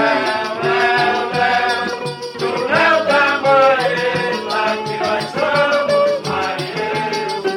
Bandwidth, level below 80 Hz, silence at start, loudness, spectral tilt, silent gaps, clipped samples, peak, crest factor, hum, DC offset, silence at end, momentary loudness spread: 16 kHz; -60 dBFS; 0 s; -16 LUFS; -4 dB/octave; none; under 0.1%; -2 dBFS; 14 dB; none; under 0.1%; 0 s; 8 LU